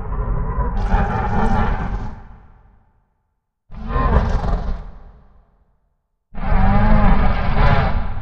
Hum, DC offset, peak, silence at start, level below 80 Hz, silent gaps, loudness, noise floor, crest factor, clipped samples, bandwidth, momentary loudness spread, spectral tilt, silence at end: none; under 0.1%; 0 dBFS; 0 s; -20 dBFS; none; -20 LUFS; -71 dBFS; 16 dB; under 0.1%; 5.8 kHz; 16 LU; -8.5 dB/octave; 0 s